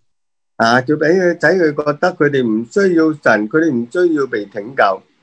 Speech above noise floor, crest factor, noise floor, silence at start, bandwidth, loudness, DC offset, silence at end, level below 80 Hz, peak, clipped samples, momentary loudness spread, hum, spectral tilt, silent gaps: 62 dB; 14 dB; -76 dBFS; 0.6 s; 9.4 kHz; -15 LUFS; under 0.1%; 0.25 s; -62 dBFS; 0 dBFS; under 0.1%; 4 LU; none; -6 dB/octave; none